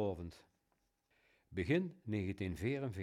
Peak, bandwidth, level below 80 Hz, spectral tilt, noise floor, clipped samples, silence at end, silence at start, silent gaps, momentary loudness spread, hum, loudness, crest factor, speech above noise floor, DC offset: -22 dBFS; 15.5 kHz; -66 dBFS; -7.5 dB/octave; -82 dBFS; under 0.1%; 0 s; 0 s; none; 11 LU; none; -40 LUFS; 18 dB; 42 dB; under 0.1%